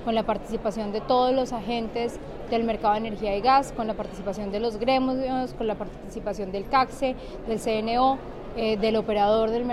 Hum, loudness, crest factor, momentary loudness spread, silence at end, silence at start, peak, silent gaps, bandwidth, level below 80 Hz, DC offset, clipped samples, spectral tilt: none; -26 LUFS; 16 dB; 10 LU; 0 s; 0 s; -10 dBFS; none; 13.5 kHz; -44 dBFS; under 0.1%; under 0.1%; -5.5 dB/octave